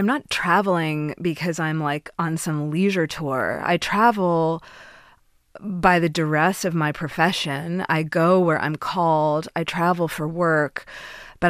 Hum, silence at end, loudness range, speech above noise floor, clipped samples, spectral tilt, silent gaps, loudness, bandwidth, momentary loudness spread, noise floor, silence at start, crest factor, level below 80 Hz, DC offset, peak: none; 0 s; 2 LU; 35 dB; under 0.1%; -5.5 dB/octave; none; -22 LUFS; 15 kHz; 8 LU; -56 dBFS; 0 s; 20 dB; -52 dBFS; under 0.1%; -2 dBFS